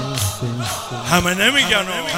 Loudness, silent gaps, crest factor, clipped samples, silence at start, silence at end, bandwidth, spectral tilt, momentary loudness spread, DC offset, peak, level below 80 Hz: -17 LUFS; none; 18 dB; under 0.1%; 0 s; 0 s; 16 kHz; -3 dB/octave; 10 LU; under 0.1%; 0 dBFS; -42 dBFS